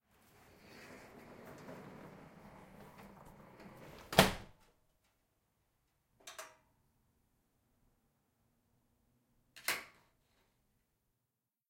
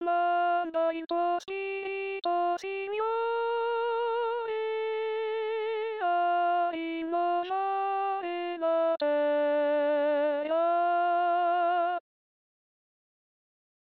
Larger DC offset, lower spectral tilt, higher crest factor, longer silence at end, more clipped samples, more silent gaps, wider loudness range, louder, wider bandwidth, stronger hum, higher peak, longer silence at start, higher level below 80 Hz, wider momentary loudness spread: neither; first, -3.5 dB/octave vs 0.5 dB/octave; first, 40 dB vs 10 dB; second, 1.85 s vs 2 s; neither; neither; first, 22 LU vs 4 LU; second, -34 LUFS vs -29 LUFS; first, 16.5 kHz vs 6.6 kHz; neither; first, -6 dBFS vs -18 dBFS; first, 0.7 s vs 0 s; first, -62 dBFS vs -82 dBFS; first, 27 LU vs 6 LU